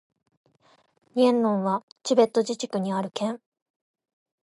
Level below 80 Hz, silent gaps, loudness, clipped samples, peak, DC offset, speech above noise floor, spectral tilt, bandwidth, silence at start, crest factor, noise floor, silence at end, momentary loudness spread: -80 dBFS; 1.83-1.96 s; -25 LUFS; under 0.1%; -6 dBFS; under 0.1%; 39 dB; -5.5 dB/octave; 11.5 kHz; 1.15 s; 20 dB; -63 dBFS; 1.05 s; 10 LU